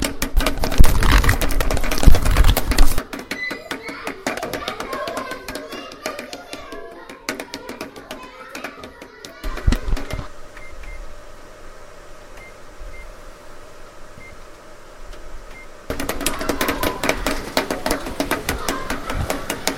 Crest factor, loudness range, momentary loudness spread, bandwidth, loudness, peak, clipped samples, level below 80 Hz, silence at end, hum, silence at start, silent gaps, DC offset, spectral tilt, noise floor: 18 dB; 21 LU; 24 LU; 17 kHz; -23 LUFS; 0 dBFS; under 0.1%; -22 dBFS; 0 s; none; 0 s; none; under 0.1%; -4 dB/octave; -39 dBFS